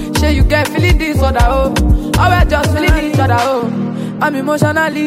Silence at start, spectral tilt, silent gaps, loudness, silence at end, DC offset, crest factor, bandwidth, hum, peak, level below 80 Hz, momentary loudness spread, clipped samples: 0 s; -6 dB/octave; none; -13 LUFS; 0 s; under 0.1%; 12 dB; 16 kHz; none; 0 dBFS; -18 dBFS; 5 LU; under 0.1%